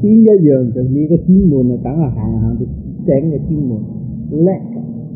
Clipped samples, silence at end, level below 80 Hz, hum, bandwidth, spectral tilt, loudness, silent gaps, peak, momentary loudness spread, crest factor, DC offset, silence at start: under 0.1%; 0 s; -32 dBFS; none; 2.6 kHz; -16.5 dB/octave; -14 LUFS; none; 0 dBFS; 14 LU; 12 dB; under 0.1%; 0 s